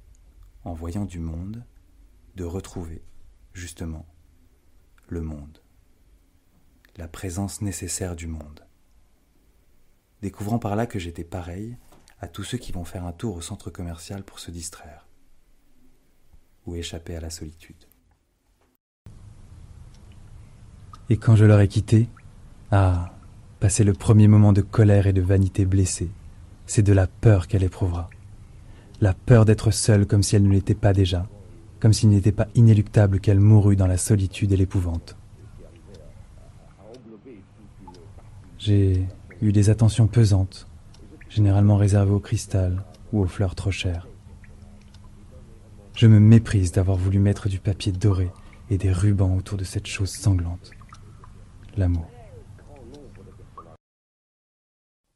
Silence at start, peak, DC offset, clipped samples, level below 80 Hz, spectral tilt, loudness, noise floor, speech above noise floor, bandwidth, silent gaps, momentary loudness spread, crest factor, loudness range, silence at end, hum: 0.65 s; -4 dBFS; under 0.1%; under 0.1%; -42 dBFS; -7 dB/octave; -21 LUFS; -65 dBFS; 45 dB; 12 kHz; 18.80-19.05 s; 20 LU; 18 dB; 19 LU; 1.55 s; none